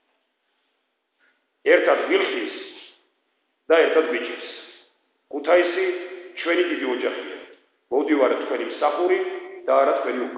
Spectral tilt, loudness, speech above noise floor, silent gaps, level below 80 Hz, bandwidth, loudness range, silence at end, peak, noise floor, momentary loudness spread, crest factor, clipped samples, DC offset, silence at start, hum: -6.5 dB/octave; -22 LUFS; 53 dB; none; -84 dBFS; 5.2 kHz; 3 LU; 0 s; -4 dBFS; -73 dBFS; 17 LU; 20 dB; under 0.1%; under 0.1%; 1.65 s; none